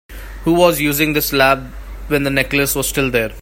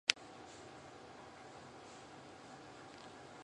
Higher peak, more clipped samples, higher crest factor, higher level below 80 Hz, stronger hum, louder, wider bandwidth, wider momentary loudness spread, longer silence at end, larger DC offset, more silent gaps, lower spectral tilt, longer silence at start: first, 0 dBFS vs -4 dBFS; neither; second, 16 dB vs 44 dB; first, -32 dBFS vs -76 dBFS; neither; first, -15 LUFS vs -49 LUFS; first, 16.5 kHz vs 11 kHz; first, 10 LU vs 4 LU; about the same, 0 s vs 0 s; neither; neither; first, -4 dB/octave vs -1 dB/octave; about the same, 0.1 s vs 0.05 s